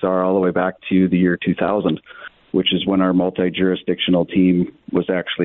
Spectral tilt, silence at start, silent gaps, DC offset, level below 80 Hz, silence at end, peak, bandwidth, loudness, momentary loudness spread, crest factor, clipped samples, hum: -11 dB/octave; 0 s; none; under 0.1%; -54 dBFS; 0 s; -6 dBFS; 4 kHz; -18 LUFS; 6 LU; 12 dB; under 0.1%; none